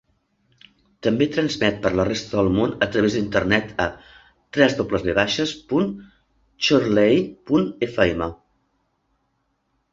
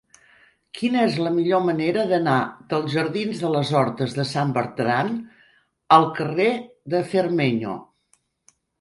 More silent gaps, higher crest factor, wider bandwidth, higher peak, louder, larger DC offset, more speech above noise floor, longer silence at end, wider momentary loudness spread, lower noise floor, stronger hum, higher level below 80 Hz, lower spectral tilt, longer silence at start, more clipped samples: neither; about the same, 20 dB vs 22 dB; second, 7.8 kHz vs 11.5 kHz; about the same, -2 dBFS vs 0 dBFS; about the same, -21 LUFS vs -22 LUFS; neither; first, 50 dB vs 44 dB; first, 1.6 s vs 0.95 s; about the same, 8 LU vs 9 LU; first, -70 dBFS vs -66 dBFS; neither; first, -46 dBFS vs -64 dBFS; about the same, -5.5 dB/octave vs -6.5 dB/octave; first, 1.05 s vs 0.75 s; neither